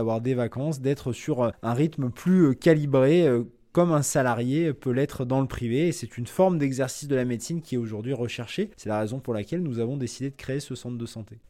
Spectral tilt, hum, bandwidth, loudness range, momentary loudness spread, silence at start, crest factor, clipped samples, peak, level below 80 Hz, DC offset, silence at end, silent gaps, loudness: -6.5 dB/octave; none; 15.5 kHz; 8 LU; 11 LU; 0 s; 18 dB; under 0.1%; -6 dBFS; -54 dBFS; under 0.1%; 0.1 s; none; -26 LUFS